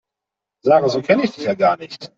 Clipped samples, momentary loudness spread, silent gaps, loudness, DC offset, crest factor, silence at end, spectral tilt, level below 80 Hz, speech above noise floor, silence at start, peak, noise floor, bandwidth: under 0.1%; 8 LU; none; -18 LUFS; under 0.1%; 16 dB; 0.1 s; -6 dB/octave; -62 dBFS; 68 dB; 0.65 s; -2 dBFS; -85 dBFS; 7.6 kHz